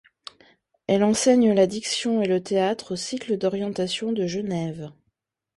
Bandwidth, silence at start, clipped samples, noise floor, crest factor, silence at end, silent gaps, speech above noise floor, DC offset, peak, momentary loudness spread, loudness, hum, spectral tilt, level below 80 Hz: 11.5 kHz; 0.9 s; under 0.1%; -76 dBFS; 18 dB; 0.65 s; none; 53 dB; under 0.1%; -6 dBFS; 20 LU; -23 LUFS; none; -4.5 dB/octave; -62 dBFS